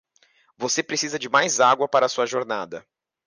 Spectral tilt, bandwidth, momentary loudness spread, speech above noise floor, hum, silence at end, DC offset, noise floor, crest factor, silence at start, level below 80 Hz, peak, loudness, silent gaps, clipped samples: -2 dB/octave; 10.5 kHz; 13 LU; 40 dB; none; 0.45 s; under 0.1%; -62 dBFS; 18 dB; 0.6 s; -74 dBFS; -6 dBFS; -22 LUFS; none; under 0.1%